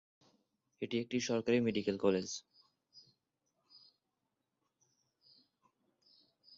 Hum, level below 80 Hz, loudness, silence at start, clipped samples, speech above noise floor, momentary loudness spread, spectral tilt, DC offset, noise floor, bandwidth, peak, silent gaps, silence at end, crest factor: none; -76 dBFS; -36 LUFS; 0.8 s; under 0.1%; 52 dB; 12 LU; -5 dB/octave; under 0.1%; -86 dBFS; 7.6 kHz; -18 dBFS; none; 3.6 s; 22 dB